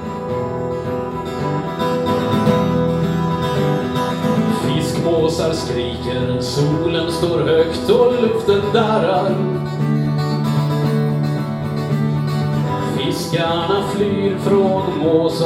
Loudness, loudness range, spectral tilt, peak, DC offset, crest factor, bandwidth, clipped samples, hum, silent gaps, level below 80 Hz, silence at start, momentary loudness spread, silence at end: -18 LUFS; 3 LU; -6.5 dB/octave; -2 dBFS; under 0.1%; 16 dB; 14.5 kHz; under 0.1%; none; none; -44 dBFS; 0 s; 6 LU; 0 s